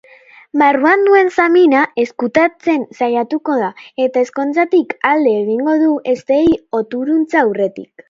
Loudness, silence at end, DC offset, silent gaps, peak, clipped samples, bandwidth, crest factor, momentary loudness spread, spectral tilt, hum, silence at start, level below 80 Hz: -14 LUFS; 0.25 s; under 0.1%; none; 0 dBFS; under 0.1%; 7.6 kHz; 14 dB; 8 LU; -6 dB/octave; none; 0.55 s; -54 dBFS